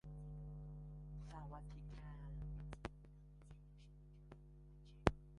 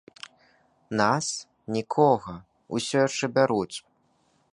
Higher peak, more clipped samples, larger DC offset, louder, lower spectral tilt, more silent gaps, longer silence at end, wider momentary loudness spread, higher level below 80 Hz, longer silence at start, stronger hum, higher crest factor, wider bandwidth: second, -14 dBFS vs -6 dBFS; neither; neither; second, -50 LUFS vs -26 LUFS; first, -7 dB/octave vs -4.5 dB/octave; neither; second, 0 s vs 0.75 s; second, 18 LU vs 21 LU; first, -56 dBFS vs -64 dBFS; second, 0.05 s vs 0.9 s; first, 50 Hz at -55 dBFS vs none; first, 36 dB vs 20 dB; about the same, 11 kHz vs 11.5 kHz